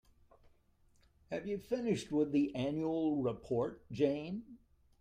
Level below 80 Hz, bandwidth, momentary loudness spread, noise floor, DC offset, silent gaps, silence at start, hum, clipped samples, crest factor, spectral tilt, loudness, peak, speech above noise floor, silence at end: -66 dBFS; 9.6 kHz; 9 LU; -70 dBFS; under 0.1%; none; 1.3 s; none; under 0.1%; 18 dB; -7 dB/octave; -36 LUFS; -20 dBFS; 34 dB; 0.45 s